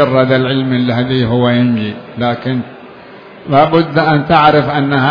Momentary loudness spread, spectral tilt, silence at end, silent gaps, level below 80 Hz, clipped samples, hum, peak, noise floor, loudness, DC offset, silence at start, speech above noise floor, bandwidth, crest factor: 10 LU; -9 dB/octave; 0 s; none; -44 dBFS; 0.1%; none; 0 dBFS; -35 dBFS; -12 LUFS; under 0.1%; 0 s; 23 dB; 5.4 kHz; 12 dB